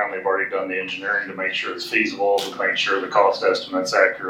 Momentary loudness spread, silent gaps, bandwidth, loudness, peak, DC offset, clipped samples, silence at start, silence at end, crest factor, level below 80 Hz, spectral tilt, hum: 6 LU; none; 16.5 kHz; -21 LUFS; -2 dBFS; under 0.1%; under 0.1%; 0 s; 0 s; 18 dB; -68 dBFS; -2.5 dB/octave; none